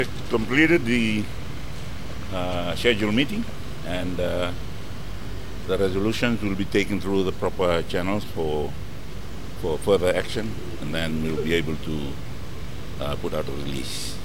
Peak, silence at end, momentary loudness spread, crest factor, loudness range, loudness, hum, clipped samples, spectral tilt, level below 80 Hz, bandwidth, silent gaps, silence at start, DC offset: -6 dBFS; 0 s; 15 LU; 20 dB; 4 LU; -25 LUFS; none; under 0.1%; -5.5 dB/octave; -40 dBFS; 17 kHz; none; 0 s; 4%